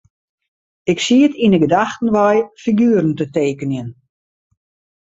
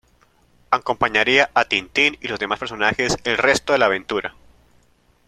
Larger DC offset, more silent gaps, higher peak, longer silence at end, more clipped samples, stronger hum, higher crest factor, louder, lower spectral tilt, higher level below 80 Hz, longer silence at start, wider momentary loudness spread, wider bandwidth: neither; neither; about the same, -2 dBFS vs 0 dBFS; first, 1.15 s vs 0.95 s; neither; neither; about the same, 16 dB vs 20 dB; first, -16 LUFS vs -19 LUFS; first, -6 dB/octave vs -3 dB/octave; second, -56 dBFS vs -50 dBFS; first, 0.85 s vs 0.7 s; about the same, 11 LU vs 10 LU; second, 8 kHz vs 14.5 kHz